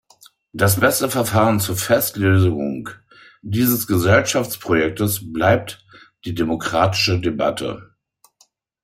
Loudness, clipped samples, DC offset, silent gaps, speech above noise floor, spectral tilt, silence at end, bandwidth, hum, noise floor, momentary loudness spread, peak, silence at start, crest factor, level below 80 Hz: -18 LUFS; under 0.1%; under 0.1%; none; 41 dB; -5 dB/octave; 1 s; 16.5 kHz; none; -60 dBFS; 15 LU; -2 dBFS; 0.55 s; 18 dB; -52 dBFS